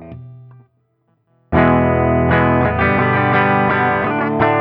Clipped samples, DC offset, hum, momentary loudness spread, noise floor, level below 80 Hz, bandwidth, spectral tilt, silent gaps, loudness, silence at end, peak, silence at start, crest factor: under 0.1%; under 0.1%; none; 4 LU; -63 dBFS; -34 dBFS; 5.4 kHz; -11 dB/octave; none; -15 LUFS; 0 s; 0 dBFS; 0 s; 16 dB